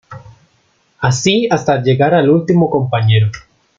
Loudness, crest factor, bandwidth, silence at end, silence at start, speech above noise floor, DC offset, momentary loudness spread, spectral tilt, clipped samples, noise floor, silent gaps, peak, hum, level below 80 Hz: -13 LUFS; 12 dB; 7.6 kHz; 0.4 s; 0.1 s; 45 dB; under 0.1%; 6 LU; -6 dB/octave; under 0.1%; -58 dBFS; none; -2 dBFS; none; -50 dBFS